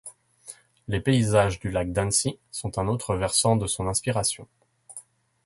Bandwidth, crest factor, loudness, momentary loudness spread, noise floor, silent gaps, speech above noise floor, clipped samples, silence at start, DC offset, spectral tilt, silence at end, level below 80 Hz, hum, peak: 12 kHz; 20 dB; -25 LUFS; 22 LU; -48 dBFS; none; 24 dB; under 0.1%; 0.05 s; under 0.1%; -4.5 dB/octave; 0.45 s; -46 dBFS; none; -8 dBFS